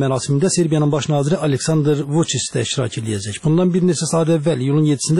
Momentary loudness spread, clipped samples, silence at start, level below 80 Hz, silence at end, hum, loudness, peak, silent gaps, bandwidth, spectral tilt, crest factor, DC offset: 5 LU; under 0.1%; 0 s; -52 dBFS; 0 s; none; -18 LUFS; -6 dBFS; none; 12 kHz; -5.5 dB/octave; 10 dB; 0.2%